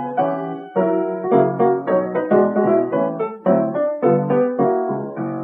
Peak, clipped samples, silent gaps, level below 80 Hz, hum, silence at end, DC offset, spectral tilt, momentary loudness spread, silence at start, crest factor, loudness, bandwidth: -2 dBFS; under 0.1%; none; -70 dBFS; none; 0 s; under 0.1%; -11.5 dB/octave; 6 LU; 0 s; 16 dB; -19 LUFS; 3.8 kHz